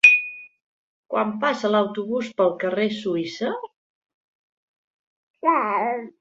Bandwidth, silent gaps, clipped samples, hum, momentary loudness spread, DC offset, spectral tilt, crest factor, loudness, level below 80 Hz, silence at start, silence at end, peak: 9.2 kHz; 0.62-1.03 s, 3.76-4.02 s, 4.14-5.34 s; under 0.1%; none; 8 LU; under 0.1%; -4.5 dB/octave; 22 dB; -22 LUFS; -72 dBFS; 0.05 s; 0.1 s; -2 dBFS